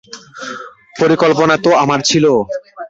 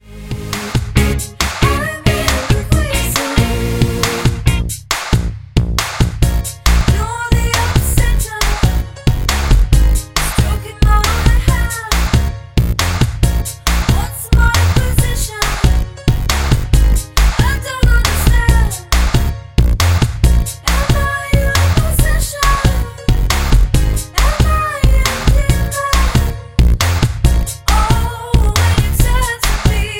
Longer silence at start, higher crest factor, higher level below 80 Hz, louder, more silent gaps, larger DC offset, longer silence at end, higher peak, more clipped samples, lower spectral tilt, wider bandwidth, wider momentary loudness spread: about the same, 0.1 s vs 0.1 s; about the same, 14 dB vs 12 dB; second, -52 dBFS vs -16 dBFS; first, -12 LUFS vs -15 LUFS; neither; neither; about the same, 0.05 s vs 0 s; about the same, 0 dBFS vs 0 dBFS; neither; about the same, -4.5 dB/octave vs -4.5 dB/octave; second, 7.8 kHz vs 17 kHz; first, 18 LU vs 4 LU